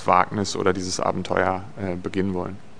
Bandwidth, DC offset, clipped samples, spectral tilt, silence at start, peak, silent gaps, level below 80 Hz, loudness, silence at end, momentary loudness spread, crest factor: 10 kHz; 1%; under 0.1%; -5 dB/octave; 0 s; 0 dBFS; none; -54 dBFS; -24 LUFS; 0.1 s; 9 LU; 24 dB